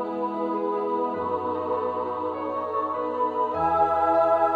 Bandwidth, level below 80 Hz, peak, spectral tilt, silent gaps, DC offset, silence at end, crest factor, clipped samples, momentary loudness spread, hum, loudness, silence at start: 7.2 kHz; -58 dBFS; -10 dBFS; -8 dB/octave; none; under 0.1%; 0 s; 14 dB; under 0.1%; 8 LU; none; -25 LUFS; 0 s